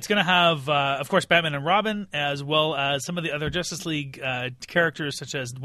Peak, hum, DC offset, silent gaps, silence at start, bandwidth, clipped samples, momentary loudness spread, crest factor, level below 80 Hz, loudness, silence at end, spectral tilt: -4 dBFS; none; under 0.1%; none; 0 s; 13 kHz; under 0.1%; 9 LU; 20 dB; -54 dBFS; -24 LUFS; 0 s; -4 dB/octave